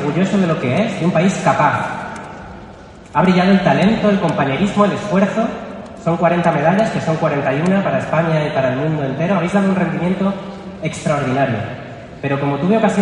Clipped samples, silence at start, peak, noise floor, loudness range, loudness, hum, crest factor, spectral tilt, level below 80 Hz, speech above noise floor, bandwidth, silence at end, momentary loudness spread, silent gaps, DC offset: under 0.1%; 0 s; 0 dBFS; -37 dBFS; 3 LU; -16 LUFS; none; 16 dB; -7 dB/octave; -46 dBFS; 22 dB; 10.5 kHz; 0 s; 13 LU; none; under 0.1%